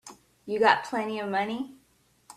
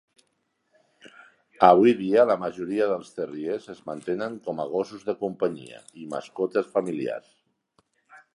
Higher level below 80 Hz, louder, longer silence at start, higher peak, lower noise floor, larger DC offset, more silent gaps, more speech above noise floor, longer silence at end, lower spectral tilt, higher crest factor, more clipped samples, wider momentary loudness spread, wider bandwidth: about the same, -72 dBFS vs -70 dBFS; about the same, -27 LUFS vs -25 LUFS; second, 0.05 s vs 1.05 s; second, -6 dBFS vs -2 dBFS; second, -63 dBFS vs -74 dBFS; neither; neither; second, 36 dB vs 49 dB; about the same, 0.05 s vs 0.15 s; second, -4 dB/octave vs -6.5 dB/octave; about the same, 24 dB vs 24 dB; neither; about the same, 16 LU vs 17 LU; first, 14 kHz vs 11 kHz